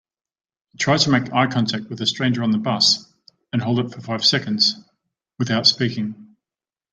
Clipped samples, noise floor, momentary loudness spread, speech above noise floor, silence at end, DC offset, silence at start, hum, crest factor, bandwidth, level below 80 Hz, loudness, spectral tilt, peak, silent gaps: under 0.1%; under -90 dBFS; 11 LU; over 70 dB; 0.65 s; under 0.1%; 0.8 s; none; 20 dB; 9.2 kHz; -62 dBFS; -19 LUFS; -4 dB/octave; -2 dBFS; none